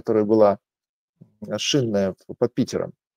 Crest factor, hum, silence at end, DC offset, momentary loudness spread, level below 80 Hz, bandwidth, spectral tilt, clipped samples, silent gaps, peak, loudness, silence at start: 20 dB; none; 0.25 s; under 0.1%; 13 LU; -64 dBFS; 15.5 kHz; -5 dB/octave; under 0.1%; 0.89-1.14 s; -4 dBFS; -22 LUFS; 0.05 s